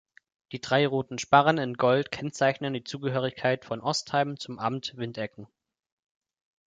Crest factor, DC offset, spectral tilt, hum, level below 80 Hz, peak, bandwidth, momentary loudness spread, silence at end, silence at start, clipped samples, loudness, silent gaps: 22 dB; under 0.1%; -5 dB/octave; none; -68 dBFS; -6 dBFS; 9.4 kHz; 12 LU; 1.25 s; 0.5 s; under 0.1%; -27 LUFS; none